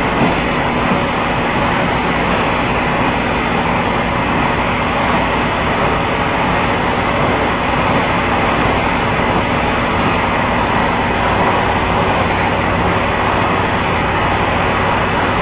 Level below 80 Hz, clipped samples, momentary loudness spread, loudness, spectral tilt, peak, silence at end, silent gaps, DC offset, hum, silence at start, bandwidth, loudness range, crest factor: -28 dBFS; under 0.1%; 1 LU; -15 LUFS; -9.5 dB/octave; -2 dBFS; 0 s; none; under 0.1%; none; 0 s; 4 kHz; 1 LU; 14 dB